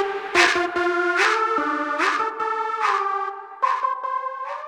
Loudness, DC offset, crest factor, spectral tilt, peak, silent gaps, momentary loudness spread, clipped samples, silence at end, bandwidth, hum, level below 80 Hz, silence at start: -21 LUFS; under 0.1%; 20 dB; -1.5 dB/octave; -2 dBFS; none; 9 LU; under 0.1%; 0 s; 18 kHz; none; -64 dBFS; 0 s